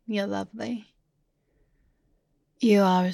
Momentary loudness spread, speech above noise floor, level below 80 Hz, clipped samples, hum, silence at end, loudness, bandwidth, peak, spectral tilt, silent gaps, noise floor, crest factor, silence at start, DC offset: 14 LU; 49 dB; -70 dBFS; under 0.1%; none; 0 s; -25 LUFS; 14 kHz; -10 dBFS; -6.5 dB/octave; none; -72 dBFS; 18 dB; 0.1 s; under 0.1%